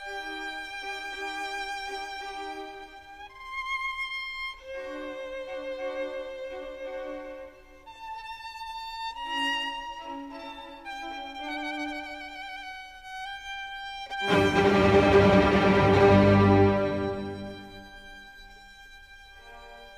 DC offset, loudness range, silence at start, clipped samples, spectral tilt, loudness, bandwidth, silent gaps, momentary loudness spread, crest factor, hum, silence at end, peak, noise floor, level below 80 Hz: under 0.1%; 16 LU; 0 s; under 0.1%; -6.5 dB/octave; -27 LUFS; 13.5 kHz; none; 25 LU; 20 dB; none; 0 s; -8 dBFS; -49 dBFS; -48 dBFS